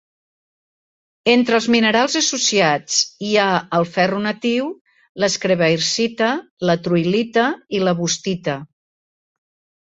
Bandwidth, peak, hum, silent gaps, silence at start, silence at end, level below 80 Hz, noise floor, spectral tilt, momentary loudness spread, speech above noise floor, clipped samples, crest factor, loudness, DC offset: 8 kHz; 0 dBFS; none; 4.81-4.85 s, 5.09-5.15 s, 6.51-6.57 s; 1.25 s; 1.15 s; -62 dBFS; under -90 dBFS; -3.5 dB/octave; 7 LU; over 72 dB; under 0.1%; 18 dB; -18 LUFS; under 0.1%